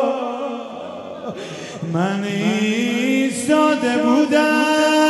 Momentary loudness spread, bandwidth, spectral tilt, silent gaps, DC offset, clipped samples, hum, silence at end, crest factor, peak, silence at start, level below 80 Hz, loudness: 15 LU; 12 kHz; -4.5 dB/octave; none; under 0.1%; under 0.1%; none; 0 s; 14 dB; -4 dBFS; 0 s; -66 dBFS; -18 LUFS